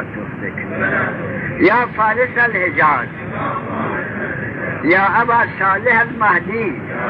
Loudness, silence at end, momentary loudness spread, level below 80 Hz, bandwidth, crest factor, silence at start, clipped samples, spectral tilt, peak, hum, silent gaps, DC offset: -16 LUFS; 0 s; 10 LU; -48 dBFS; 5.6 kHz; 14 dB; 0 s; under 0.1%; -9 dB/octave; -2 dBFS; none; none; under 0.1%